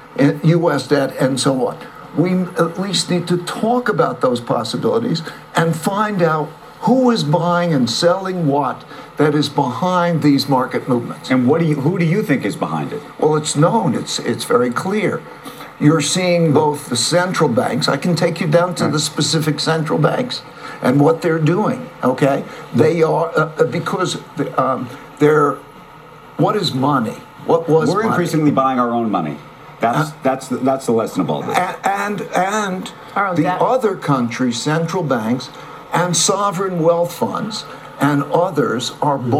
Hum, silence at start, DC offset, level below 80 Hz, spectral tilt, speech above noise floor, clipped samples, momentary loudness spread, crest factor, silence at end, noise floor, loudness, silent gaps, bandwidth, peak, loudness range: none; 0 s; under 0.1%; -58 dBFS; -5.5 dB/octave; 23 dB; under 0.1%; 8 LU; 16 dB; 0 s; -39 dBFS; -17 LUFS; none; 15.5 kHz; 0 dBFS; 2 LU